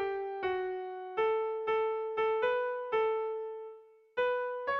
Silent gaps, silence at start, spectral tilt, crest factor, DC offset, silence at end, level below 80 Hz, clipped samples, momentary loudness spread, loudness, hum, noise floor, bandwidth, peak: none; 0 s; -5.5 dB/octave; 14 dB; under 0.1%; 0 s; -72 dBFS; under 0.1%; 9 LU; -33 LUFS; none; -53 dBFS; 5.4 kHz; -20 dBFS